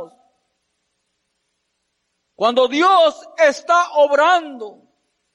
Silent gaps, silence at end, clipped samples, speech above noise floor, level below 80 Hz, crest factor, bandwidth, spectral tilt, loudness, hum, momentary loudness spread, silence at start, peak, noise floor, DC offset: none; 0.65 s; under 0.1%; 57 dB; -76 dBFS; 14 dB; 11 kHz; -2 dB/octave; -15 LUFS; none; 13 LU; 0 s; -4 dBFS; -72 dBFS; under 0.1%